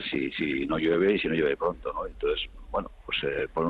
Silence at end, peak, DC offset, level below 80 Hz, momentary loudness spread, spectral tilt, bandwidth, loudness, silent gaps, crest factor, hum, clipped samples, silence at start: 0 s; -12 dBFS; under 0.1%; -48 dBFS; 10 LU; -7.5 dB/octave; 4.9 kHz; -28 LUFS; none; 16 dB; none; under 0.1%; 0 s